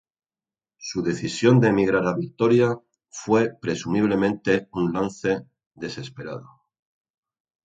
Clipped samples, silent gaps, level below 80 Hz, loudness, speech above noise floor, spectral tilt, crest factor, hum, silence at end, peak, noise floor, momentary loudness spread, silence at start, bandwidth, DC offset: under 0.1%; 5.67-5.71 s; -56 dBFS; -22 LUFS; over 68 dB; -6.5 dB/octave; 20 dB; none; 1.25 s; -4 dBFS; under -90 dBFS; 17 LU; 0.8 s; 9.2 kHz; under 0.1%